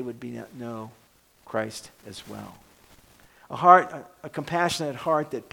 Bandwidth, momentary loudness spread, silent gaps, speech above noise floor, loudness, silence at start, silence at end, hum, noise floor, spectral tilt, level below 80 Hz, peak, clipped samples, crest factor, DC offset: 19 kHz; 25 LU; none; 30 dB; -23 LUFS; 0 s; 0.1 s; none; -55 dBFS; -4.5 dB/octave; -64 dBFS; -2 dBFS; under 0.1%; 26 dB; under 0.1%